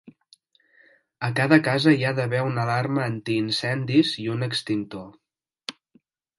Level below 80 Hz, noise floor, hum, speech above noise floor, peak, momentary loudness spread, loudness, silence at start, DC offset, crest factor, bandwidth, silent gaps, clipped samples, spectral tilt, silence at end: -66 dBFS; -63 dBFS; none; 40 dB; -2 dBFS; 18 LU; -23 LUFS; 0.05 s; under 0.1%; 22 dB; 11.5 kHz; none; under 0.1%; -6 dB/octave; 0.7 s